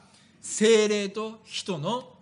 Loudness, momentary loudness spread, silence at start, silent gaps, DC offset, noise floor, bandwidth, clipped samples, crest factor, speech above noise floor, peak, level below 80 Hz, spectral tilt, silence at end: -26 LUFS; 14 LU; 0.45 s; none; under 0.1%; -46 dBFS; 10.5 kHz; under 0.1%; 16 dB; 20 dB; -10 dBFS; -76 dBFS; -3.5 dB/octave; 0.1 s